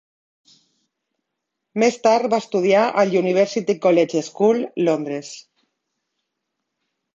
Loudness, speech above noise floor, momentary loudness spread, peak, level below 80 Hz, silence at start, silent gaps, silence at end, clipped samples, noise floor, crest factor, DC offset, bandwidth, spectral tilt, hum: -19 LUFS; 62 dB; 12 LU; -4 dBFS; -70 dBFS; 1.75 s; none; 1.75 s; under 0.1%; -80 dBFS; 18 dB; under 0.1%; 8 kHz; -5.5 dB/octave; none